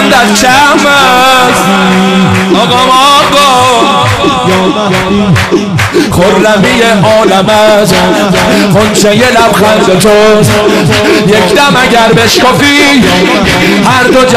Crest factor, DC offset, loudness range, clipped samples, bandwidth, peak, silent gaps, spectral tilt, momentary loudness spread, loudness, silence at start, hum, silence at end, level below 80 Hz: 4 dB; under 0.1%; 2 LU; 2%; 16 kHz; 0 dBFS; none; -4 dB/octave; 4 LU; -5 LUFS; 0 s; none; 0 s; -30 dBFS